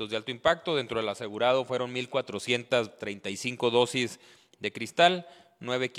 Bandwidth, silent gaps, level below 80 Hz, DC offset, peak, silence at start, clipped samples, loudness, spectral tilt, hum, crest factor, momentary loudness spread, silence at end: 14 kHz; none; -68 dBFS; under 0.1%; -6 dBFS; 0 s; under 0.1%; -28 LUFS; -4 dB/octave; none; 22 dB; 12 LU; 0 s